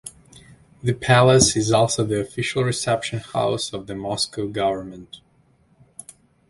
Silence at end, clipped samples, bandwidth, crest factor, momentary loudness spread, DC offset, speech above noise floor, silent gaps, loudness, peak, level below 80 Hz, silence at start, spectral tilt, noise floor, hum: 1.35 s; under 0.1%; 11.5 kHz; 20 dB; 23 LU; under 0.1%; 38 dB; none; -20 LUFS; -2 dBFS; -48 dBFS; 0.05 s; -4 dB/octave; -59 dBFS; none